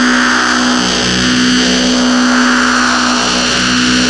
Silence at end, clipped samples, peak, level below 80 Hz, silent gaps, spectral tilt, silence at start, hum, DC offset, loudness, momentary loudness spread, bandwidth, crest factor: 0 s; under 0.1%; 0 dBFS; -34 dBFS; none; -2.5 dB/octave; 0 s; none; under 0.1%; -10 LUFS; 1 LU; 11.5 kHz; 10 dB